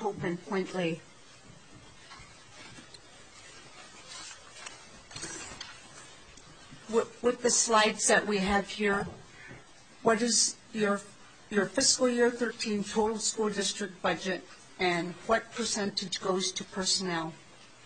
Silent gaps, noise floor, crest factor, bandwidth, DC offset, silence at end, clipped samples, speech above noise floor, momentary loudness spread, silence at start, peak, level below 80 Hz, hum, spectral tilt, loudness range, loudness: none; -54 dBFS; 22 dB; 9.6 kHz; 0.1%; 0.2 s; under 0.1%; 25 dB; 24 LU; 0 s; -10 dBFS; -60 dBFS; none; -2.5 dB/octave; 17 LU; -29 LUFS